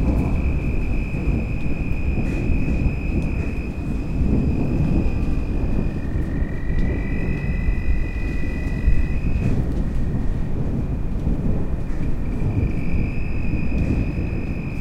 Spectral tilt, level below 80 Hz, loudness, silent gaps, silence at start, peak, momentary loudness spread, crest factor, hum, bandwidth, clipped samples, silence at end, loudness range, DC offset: -9 dB/octave; -24 dBFS; -24 LUFS; none; 0 s; -6 dBFS; 5 LU; 14 dB; none; 7.4 kHz; under 0.1%; 0 s; 2 LU; under 0.1%